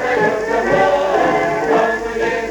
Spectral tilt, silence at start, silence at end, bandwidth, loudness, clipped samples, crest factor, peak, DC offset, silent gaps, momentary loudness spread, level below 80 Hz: -5 dB/octave; 0 s; 0 s; 17.5 kHz; -16 LUFS; under 0.1%; 14 dB; -2 dBFS; under 0.1%; none; 5 LU; -42 dBFS